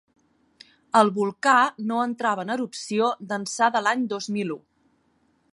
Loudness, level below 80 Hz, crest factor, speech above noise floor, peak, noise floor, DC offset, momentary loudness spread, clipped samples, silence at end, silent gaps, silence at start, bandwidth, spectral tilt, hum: -23 LUFS; -78 dBFS; 22 dB; 43 dB; -2 dBFS; -66 dBFS; under 0.1%; 10 LU; under 0.1%; 0.95 s; none; 0.95 s; 11.5 kHz; -4 dB/octave; none